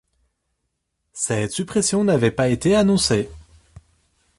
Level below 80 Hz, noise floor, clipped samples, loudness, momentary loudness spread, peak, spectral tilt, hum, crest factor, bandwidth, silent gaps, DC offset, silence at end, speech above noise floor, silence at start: -46 dBFS; -75 dBFS; under 0.1%; -19 LUFS; 9 LU; -4 dBFS; -4.5 dB/octave; none; 18 dB; 11.5 kHz; none; under 0.1%; 1 s; 56 dB; 1.15 s